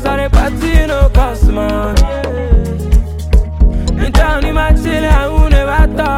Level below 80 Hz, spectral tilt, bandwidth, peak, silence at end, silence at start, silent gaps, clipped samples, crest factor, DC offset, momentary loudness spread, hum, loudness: -12 dBFS; -6.5 dB/octave; 13.5 kHz; 0 dBFS; 0 s; 0 s; none; under 0.1%; 10 dB; under 0.1%; 3 LU; none; -13 LUFS